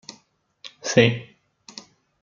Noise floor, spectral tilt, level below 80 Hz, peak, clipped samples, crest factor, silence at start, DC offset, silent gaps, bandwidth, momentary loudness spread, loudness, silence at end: -60 dBFS; -4.5 dB/octave; -60 dBFS; -2 dBFS; under 0.1%; 24 dB; 0.65 s; under 0.1%; none; 7.4 kHz; 25 LU; -21 LUFS; 1 s